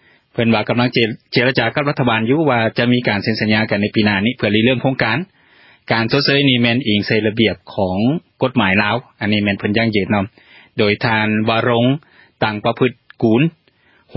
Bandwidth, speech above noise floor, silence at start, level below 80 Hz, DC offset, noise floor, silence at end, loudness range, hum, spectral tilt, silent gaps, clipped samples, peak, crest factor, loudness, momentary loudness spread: 5.8 kHz; 39 dB; 0.35 s; -46 dBFS; under 0.1%; -55 dBFS; 0.65 s; 2 LU; none; -9.5 dB/octave; none; under 0.1%; 0 dBFS; 16 dB; -16 LUFS; 6 LU